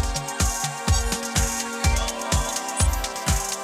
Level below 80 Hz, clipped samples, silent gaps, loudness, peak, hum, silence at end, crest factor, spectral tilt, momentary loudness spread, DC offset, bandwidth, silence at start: -28 dBFS; under 0.1%; none; -24 LUFS; -6 dBFS; none; 0 s; 18 dB; -3 dB/octave; 2 LU; under 0.1%; 16.5 kHz; 0 s